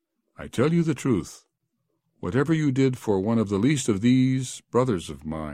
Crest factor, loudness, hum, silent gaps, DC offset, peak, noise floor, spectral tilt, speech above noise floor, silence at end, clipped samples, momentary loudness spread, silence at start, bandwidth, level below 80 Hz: 16 dB; -24 LUFS; none; none; under 0.1%; -8 dBFS; -76 dBFS; -6.5 dB/octave; 53 dB; 0 s; under 0.1%; 12 LU; 0.4 s; 15 kHz; -54 dBFS